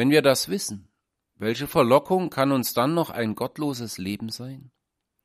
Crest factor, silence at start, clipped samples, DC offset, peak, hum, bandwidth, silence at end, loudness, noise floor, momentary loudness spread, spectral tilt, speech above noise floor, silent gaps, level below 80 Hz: 20 dB; 0 s; under 0.1%; under 0.1%; -4 dBFS; none; 15.5 kHz; 0.55 s; -24 LUFS; -78 dBFS; 14 LU; -5 dB/octave; 55 dB; none; -60 dBFS